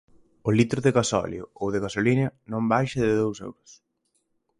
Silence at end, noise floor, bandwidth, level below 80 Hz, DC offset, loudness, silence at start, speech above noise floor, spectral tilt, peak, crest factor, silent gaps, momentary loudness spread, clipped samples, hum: 1.05 s; -73 dBFS; 11.5 kHz; -54 dBFS; under 0.1%; -25 LUFS; 0.45 s; 49 dB; -6 dB/octave; -6 dBFS; 20 dB; none; 10 LU; under 0.1%; none